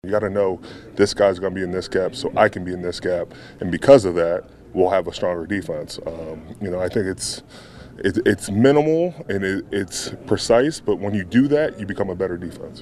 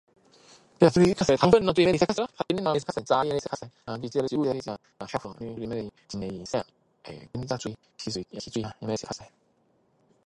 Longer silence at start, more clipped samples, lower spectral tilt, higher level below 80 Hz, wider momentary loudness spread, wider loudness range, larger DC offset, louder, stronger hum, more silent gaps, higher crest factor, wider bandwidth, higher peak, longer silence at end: second, 0.05 s vs 0.8 s; neither; about the same, -5.5 dB/octave vs -6 dB/octave; first, -48 dBFS vs -56 dBFS; second, 15 LU vs 18 LU; second, 5 LU vs 12 LU; neither; first, -21 LUFS vs -27 LUFS; neither; neither; about the same, 20 dB vs 22 dB; first, 13 kHz vs 11.5 kHz; first, 0 dBFS vs -6 dBFS; second, 0 s vs 1 s